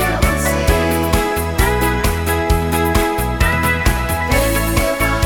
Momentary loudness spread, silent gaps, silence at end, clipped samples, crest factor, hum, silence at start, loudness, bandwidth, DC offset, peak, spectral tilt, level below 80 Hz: 2 LU; none; 0 s; under 0.1%; 16 dB; none; 0 s; -16 LUFS; 19 kHz; 0.7%; 0 dBFS; -5 dB/octave; -20 dBFS